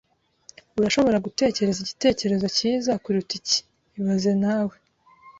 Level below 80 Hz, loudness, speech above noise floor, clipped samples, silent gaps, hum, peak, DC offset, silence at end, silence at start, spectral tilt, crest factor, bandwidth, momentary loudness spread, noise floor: -56 dBFS; -23 LUFS; 31 dB; under 0.1%; none; none; -6 dBFS; under 0.1%; 0.1 s; 0.75 s; -4.5 dB/octave; 18 dB; 8 kHz; 6 LU; -54 dBFS